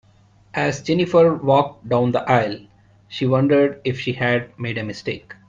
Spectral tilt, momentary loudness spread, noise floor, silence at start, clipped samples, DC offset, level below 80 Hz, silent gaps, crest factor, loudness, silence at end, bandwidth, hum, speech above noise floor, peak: -6.5 dB/octave; 12 LU; -53 dBFS; 0.55 s; under 0.1%; under 0.1%; -54 dBFS; none; 18 dB; -20 LUFS; 0.15 s; 7.6 kHz; none; 34 dB; -2 dBFS